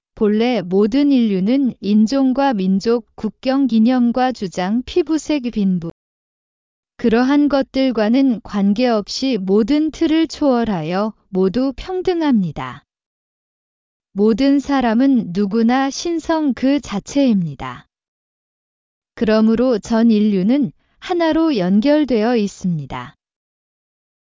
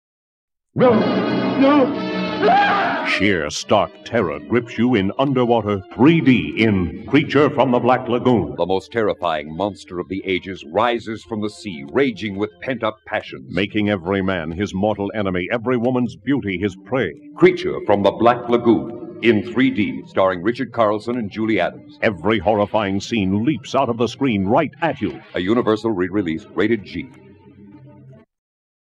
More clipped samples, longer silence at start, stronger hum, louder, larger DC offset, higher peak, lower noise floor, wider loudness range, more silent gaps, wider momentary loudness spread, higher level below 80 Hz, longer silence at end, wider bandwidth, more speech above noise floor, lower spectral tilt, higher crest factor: neither; second, 0.15 s vs 0.75 s; neither; about the same, -17 LUFS vs -19 LUFS; neither; second, -4 dBFS vs 0 dBFS; first, under -90 dBFS vs -45 dBFS; about the same, 4 LU vs 6 LU; first, 5.91-6.83 s, 13.06-14.00 s, 18.08-19.02 s vs none; about the same, 8 LU vs 10 LU; about the same, -48 dBFS vs -50 dBFS; first, 1.2 s vs 0.75 s; second, 7.6 kHz vs 9.8 kHz; first, over 74 dB vs 26 dB; about the same, -6.5 dB/octave vs -6.5 dB/octave; about the same, 14 dB vs 18 dB